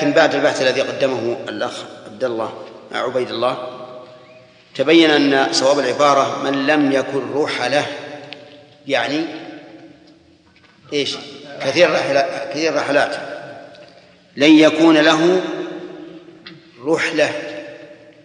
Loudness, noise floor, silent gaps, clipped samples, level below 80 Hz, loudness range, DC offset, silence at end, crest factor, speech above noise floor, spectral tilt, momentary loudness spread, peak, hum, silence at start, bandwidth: -17 LUFS; -51 dBFS; none; under 0.1%; -70 dBFS; 9 LU; under 0.1%; 0.3 s; 18 dB; 35 dB; -4 dB/octave; 23 LU; 0 dBFS; none; 0 s; 10 kHz